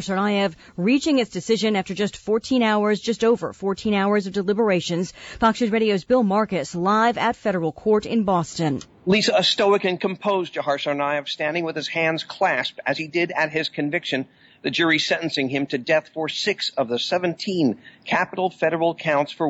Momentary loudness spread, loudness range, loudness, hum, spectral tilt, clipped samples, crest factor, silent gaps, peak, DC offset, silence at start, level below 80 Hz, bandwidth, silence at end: 7 LU; 2 LU; -22 LUFS; none; -5 dB/octave; under 0.1%; 14 dB; none; -8 dBFS; under 0.1%; 0 s; -56 dBFS; 8 kHz; 0 s